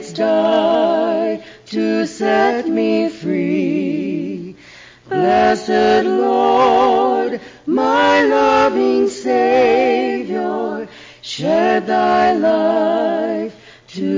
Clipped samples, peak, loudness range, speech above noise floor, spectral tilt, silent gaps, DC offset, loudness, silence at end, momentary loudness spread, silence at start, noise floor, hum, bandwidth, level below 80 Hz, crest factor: under 0.1%; -4 dBFS; 4 LU; 28 dB; -5.5 dB/octave; none; under 0.1%; -16 LUFS; 0 s; 12 LU; 0 s; -42 dBFS; none; 7.6 kHz; -52 dBFS; 12 dB